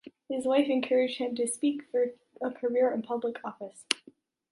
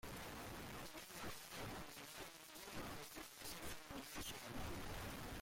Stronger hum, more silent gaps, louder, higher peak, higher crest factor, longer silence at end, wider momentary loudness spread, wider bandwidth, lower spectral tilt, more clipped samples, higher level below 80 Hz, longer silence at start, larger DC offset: neither; neither; first, -30 LUFS vs -51 LUFS; first, -4 dBFS vs -38 dBFS; first, 26 dB vs 14 dB; first, 0.55 s vs 0 s; first, 11 LU vs 4 LU; second, 11.5 kHz vs 16.5 kHz; about the same, -3 dB/octave vs -3.5 dB/octave; neither; second, -80 dBFS vs -62 dBFS; about the same, 0.05 s vs 0.05 s; neither